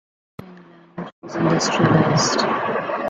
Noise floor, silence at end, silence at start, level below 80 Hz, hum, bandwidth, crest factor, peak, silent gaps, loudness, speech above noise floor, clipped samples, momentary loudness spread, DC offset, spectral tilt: -45 dBFS; 0 s; 0.4 s; -54 dBFS; none; 9.2 kHz; 18 dB; -4 dBFS; 1.12-1.22 s; -18 LUFS; 27 dB; under 0.1%; 19 LU; under 0.1%; -5 dB/octave